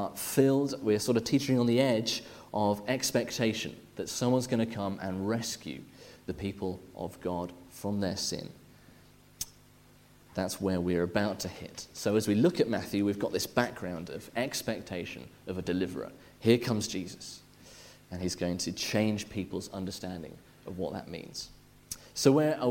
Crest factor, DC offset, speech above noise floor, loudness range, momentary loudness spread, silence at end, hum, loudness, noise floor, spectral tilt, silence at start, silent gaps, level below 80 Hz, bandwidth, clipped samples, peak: 22 dB; under 0.1%; 28 dB; 7 LU; 16 LU; 0 s; none; -31 LUFS; -59 dBFS; -5 dB/octave; 0 s; none; -62 dBFS; 16.5 kHz; under 0.1%; -10 dBFS